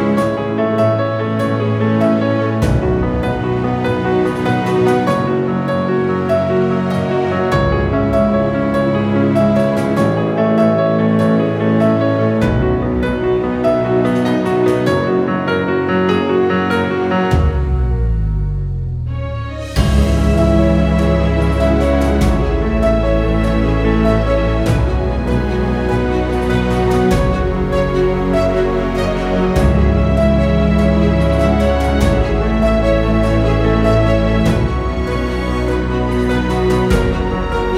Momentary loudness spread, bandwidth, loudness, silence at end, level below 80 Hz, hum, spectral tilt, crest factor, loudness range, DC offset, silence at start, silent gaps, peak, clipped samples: 4 LU; 13.5 kHz; -15 LUFS; 0 s; -22 dBFS; none; -7.5 dB/octave; 14 dB; 2 LU; under 0.1%; 0 s; none; 0 dBFS; under 0.1%